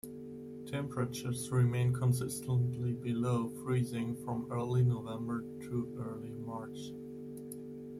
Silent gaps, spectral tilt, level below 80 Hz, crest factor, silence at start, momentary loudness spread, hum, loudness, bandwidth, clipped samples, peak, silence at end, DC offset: none; -7 dB/octave; -66 dBFS; 16 dB; 0.05 s; 14 LU; none; -36 LUFS; 14.5 kHz; under 0.1%; -20 dBFS; 0 s; under 0.1%